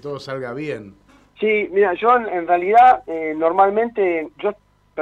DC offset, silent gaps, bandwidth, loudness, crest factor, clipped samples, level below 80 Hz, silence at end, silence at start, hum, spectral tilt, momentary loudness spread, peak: under 0.1%; none; 7.2 kHz; -18 LUFS; 16 dB; under 0.1%; -58 dBFS; 0 s; 0.05 s; 50 Hz at -55 dBFS; -6.5 dB/octave; 16 LU; -2 dBFS